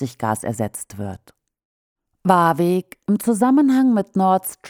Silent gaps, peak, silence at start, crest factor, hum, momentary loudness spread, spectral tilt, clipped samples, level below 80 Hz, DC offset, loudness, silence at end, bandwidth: 1.65-1.96 s; 0 dBFS; 0 s; 18 dB; none; 13 LU; -6.5 dB/octave; under 0.1%; -60 dBFS; under 0.1%; -18 LUFS; 0 s; 17 kHz